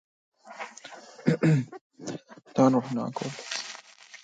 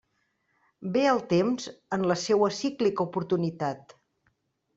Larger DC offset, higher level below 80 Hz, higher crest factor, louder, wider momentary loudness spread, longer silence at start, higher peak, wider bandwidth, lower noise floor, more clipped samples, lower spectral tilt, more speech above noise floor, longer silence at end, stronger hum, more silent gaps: neither; about the same, -70 dBFS vs -68 dBFS; about the same, 20 dB vs 18 dB; about the same, -27 LUFS vs -27 LUFS; first, 22 LU vs 9 LU; second, 0.45 s vs 0.8 s; about the same, -8 dBFS vs -10 dBFS; first, 9.2 kHz vs 8 kHz; second, -49 dBFS vs -74 dBFS; neither; about the same, -6.5 dB/octave vs -5.5 dB/octave; second, 24 dB vs 48 dB; second, 0.05 s vs 0.95 s; neither; first, 1.81-1.90 s vs none